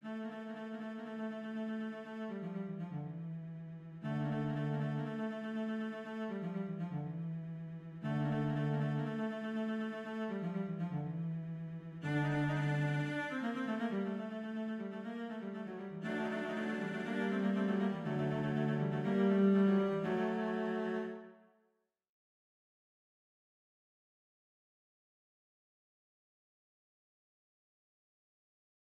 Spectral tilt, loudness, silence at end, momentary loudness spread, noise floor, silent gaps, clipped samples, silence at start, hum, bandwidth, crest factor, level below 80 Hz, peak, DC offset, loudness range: -8.5 dB/octave; -38 LUFS; 7.6 s; 10 LU; -80 dBFS; none; under 0.1%; 0.05 s; none; 8.4 kHz; 18 dB; -74 dBFS; -20 dBFS; under 0.1%; 9 LU